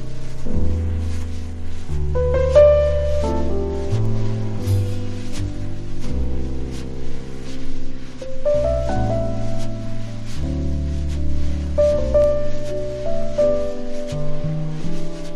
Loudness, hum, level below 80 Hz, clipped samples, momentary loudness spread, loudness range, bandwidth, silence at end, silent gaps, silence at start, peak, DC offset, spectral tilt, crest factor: -22 LUFS; none; -24 dBFS; under 0.1%; 14 LU; 8 LU; 7.6 kHz; 0 s; none; 0 s; -2 dBFS; under 0.1%; -7.5 dB/octave; 16 dB